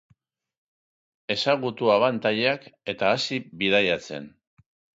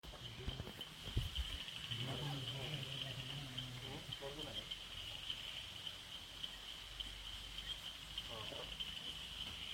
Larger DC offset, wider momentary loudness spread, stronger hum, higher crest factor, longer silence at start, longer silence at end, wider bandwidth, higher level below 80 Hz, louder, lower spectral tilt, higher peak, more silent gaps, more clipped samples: neither; first, 13 LU vs 5 LU; neither; about the same, 20 dB vs 24 dB; first, 1.3 s vs 0.05 s; first, 0.65 s vs 0 s; second, 8 kHz vs 16.5 kHz; second, -64 dBFS vs -56 dBFS; first, -24 LUFS vs -46 LUFS; about the same, -4.5 dB/octave vs -3.5 dB/octave; first, -6 dBFS vs -24 dBFS; neither; neither